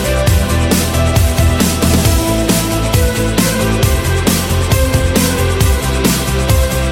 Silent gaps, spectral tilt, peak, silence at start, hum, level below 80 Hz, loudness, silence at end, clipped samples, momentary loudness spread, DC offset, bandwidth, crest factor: none; -4.5 dB/octave; 0 dBFS; 0 s; none; -18 dBFS; -13 LUFS; 0 s; under 0.1%; 2 LU; under 0.1%; 17 kHz; 12 dB